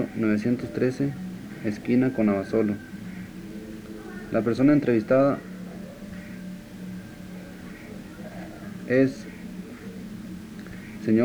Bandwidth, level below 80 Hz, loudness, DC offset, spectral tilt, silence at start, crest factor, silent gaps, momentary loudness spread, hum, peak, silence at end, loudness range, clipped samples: over 20 kHz; -54 dBFS; -24 LUFS; under 0.1%; -8 dB/octave; 0 s; 18 dB; none; 18 LU; none; -8 dBFS; 0 s; 7 LU; under 0.1%